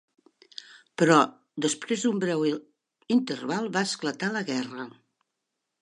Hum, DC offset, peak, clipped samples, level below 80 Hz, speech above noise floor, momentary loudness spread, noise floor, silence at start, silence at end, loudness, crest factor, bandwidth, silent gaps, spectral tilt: none; under 0.1%; -6 dBFS; under 0.1%; -78 dBFS; 57 dB; 21 LU; -83 dBFS; 0.7 s; 0.9 s; -26 LUFS; 22 dB; 11.5 kHz; none; -4.5 dB/octave